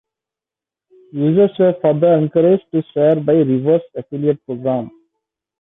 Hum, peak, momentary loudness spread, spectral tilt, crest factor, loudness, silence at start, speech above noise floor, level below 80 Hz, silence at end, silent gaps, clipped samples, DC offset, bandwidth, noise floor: none; -4 dBFS; 8 LU; -12 dB/octave; 14 dB; -16 LUFS; 1.15 s; 73 dB; -62 dBFS; 0.7 s; none; under 0.1%; under 0.1%; 3.9 kHz; -88 dBFS